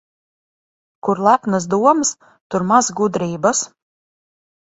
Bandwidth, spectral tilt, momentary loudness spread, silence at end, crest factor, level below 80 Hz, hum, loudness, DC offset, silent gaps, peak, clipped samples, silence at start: 8.2 kHz; -4.5 dB/octave; 10 LU; 1 s; 18 dB; -60 dBFS; none; -17 LUFS; under 0.1%; 2.41-2.50 s; 0 dBFS; under 0.1%; 1.05 s